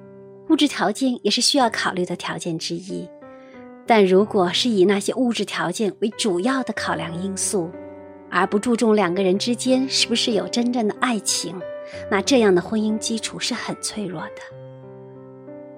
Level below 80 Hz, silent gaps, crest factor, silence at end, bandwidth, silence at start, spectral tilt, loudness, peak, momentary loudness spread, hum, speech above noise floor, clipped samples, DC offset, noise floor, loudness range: -64 dBFS; none; 20 dB; 0 s; 16 kHz; 0 s; -3.5 dB/octave; -21 LUFS; -2 dBFS; 21 LU; none; 21 dB; under 0.1%; under 0.1%; -42 dBFS; 3 LU